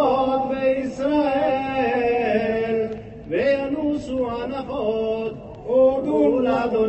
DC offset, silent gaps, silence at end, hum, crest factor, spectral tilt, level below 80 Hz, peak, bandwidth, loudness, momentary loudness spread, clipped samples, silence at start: under 0.1%; none; 0 s; none; 14 dB; -7 dB/octave; -48 dBFS; -8 dBFS; 8.4 kHz; -22 LUFS; 9 LU; under 0.1%; 0 s